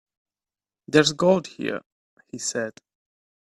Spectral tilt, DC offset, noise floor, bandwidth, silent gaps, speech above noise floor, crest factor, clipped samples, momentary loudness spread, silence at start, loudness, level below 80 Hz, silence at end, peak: -4 dB/octave; under 0.1%; under -90 dBFS; 12.5 kHz; 1.86-2.17 s; over 68 dB; 24 dB; under 0.1%; 15 LU; 0.9 s; -23 LUFS; -66 dBFS; 0.85 s; -2 dBFS